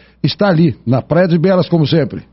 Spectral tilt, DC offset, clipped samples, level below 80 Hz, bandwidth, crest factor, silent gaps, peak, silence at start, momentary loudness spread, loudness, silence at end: -6.5 dB/octave; under 0.1%; under 0.1%; -46 dBFS; 5.8 kHz; 12 dB; none; -2 dBFS; 0.25 s; 4 LU; -13 LUFS; 0.1 s